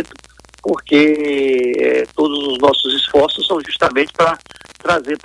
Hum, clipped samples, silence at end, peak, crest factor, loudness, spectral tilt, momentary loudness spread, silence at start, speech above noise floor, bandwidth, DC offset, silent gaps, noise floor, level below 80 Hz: none; under 0.1%; 0.05 s; 0 dBFS; 16 dB; -15 LUFS; -4.5 dB/octave; 9 LU; 0 s; 29 dB; 11.5 kHz; under 0.1%; none; -44 dBFS; -50 dBFS